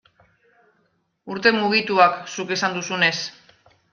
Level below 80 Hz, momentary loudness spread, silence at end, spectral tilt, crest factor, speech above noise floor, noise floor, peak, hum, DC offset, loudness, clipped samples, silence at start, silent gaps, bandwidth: -68 dBFS; 12 LU; 0.6 s; -3.5 dB/octave; 22 dB; 47 dB; -68 dBFS; -2 dBFS; none; under 0.1%; -20 LUFS; under 0.1%; 1.25 s; none; 7.2 kHz